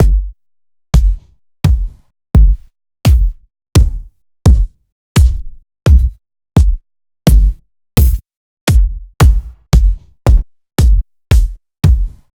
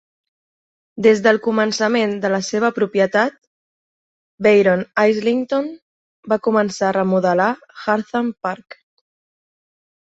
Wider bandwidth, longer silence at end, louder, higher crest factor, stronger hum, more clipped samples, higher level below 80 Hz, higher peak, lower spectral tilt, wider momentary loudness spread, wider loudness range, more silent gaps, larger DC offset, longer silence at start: first, 18.5 kHz vs 8 kHz; second, 0.25 s vs 1.5 s; first, -14 LUFS vs -18 LUFS; second, 12 dB vs 18 dB; neither; neither; first, -12 dBFS vs -64 dBFS; about the same, 0 dBFS vs -2 dBFS; first, -6.5 dB/octave vs -5 dB/octave; about the same, 10 LU vs 9 LU; about the same, 1 LU vs 2 LU; second, 4.92-5.15 s, 8.37-8.67 s vs 3.38-4.38 s, 5.82-6.23 s; neither; second, 0 s vs 0.95 s